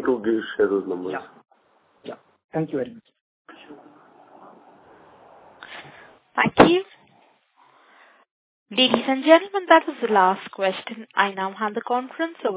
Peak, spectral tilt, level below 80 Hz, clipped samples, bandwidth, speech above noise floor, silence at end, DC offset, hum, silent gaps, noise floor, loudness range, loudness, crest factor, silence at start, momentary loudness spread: 0 dBFS; -8.5 dB/octave; -60 dBFS; under 0.1%; 4 kHz; 41 dB; 0 s; under 0.1%; none; 2.44-2.49 s, 3.21-3.45 s, 8.31-8.66 s; -62 dBFS; 15 LU; -21 LUFS; 24 dB; 0 s; 23 LU